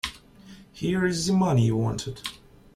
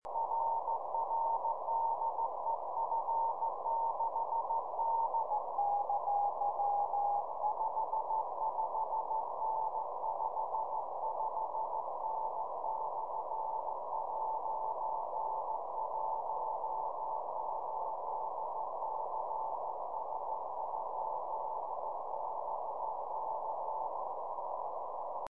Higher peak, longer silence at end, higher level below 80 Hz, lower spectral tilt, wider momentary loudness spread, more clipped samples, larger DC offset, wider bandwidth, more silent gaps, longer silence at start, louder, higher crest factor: first, -10 dBFS vs -24 dBFS; first, 0.4 s vs 0 s; first, -50 dBFS vs -80 dBFS; about the same, -5.5 dB/octave vs -6 dB/octave; first, 13 LU vs 6 LU; neither; second, under 0.1% vs 0.3%; first, 14 kHz vs 2.5 kHz; neither; about the same, 0.05 s vs 0 s; first, -25 LUFS vs -37 LUFS; about the same, 16 dB vs 12 dB